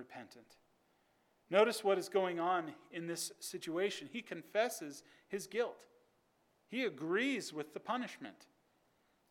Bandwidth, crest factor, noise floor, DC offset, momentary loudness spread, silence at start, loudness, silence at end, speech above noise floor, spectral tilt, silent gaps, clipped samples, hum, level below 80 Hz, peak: 18 kHz; 24 dB; -76 dBFS; under 0.1%; 15 LU; 0 s; -38 LUFS; 0.85 s; 38 dB; -3.5 dB/octave; none; under 0.1%; none; under -90 dBFS; -16 dBFS